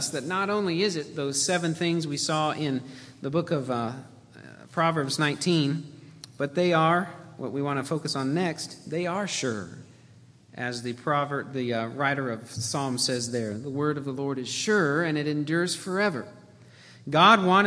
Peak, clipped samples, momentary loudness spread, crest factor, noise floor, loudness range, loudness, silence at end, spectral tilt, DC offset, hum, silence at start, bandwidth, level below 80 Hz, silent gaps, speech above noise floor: -4 dBFS; under 0.1%; 12 LU; 24 dB; -53 dBFS; 4 LU; -26 LUFS; 0 s; -4.5 dB/octave; under 0.1%; none; 0 s; 11 kHz; -70 dBFS; none; 27 dB